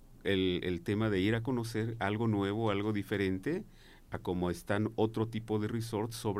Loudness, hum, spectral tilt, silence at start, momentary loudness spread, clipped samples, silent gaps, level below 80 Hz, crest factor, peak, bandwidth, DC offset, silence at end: -34 LUFS; none; -6.5 dB/octave; 0 s; 6 LU; under 0.1%; none; -56 dBFS; 16 dB; -16 dBFS; 15.5 kHz; under 0.1%; 0 s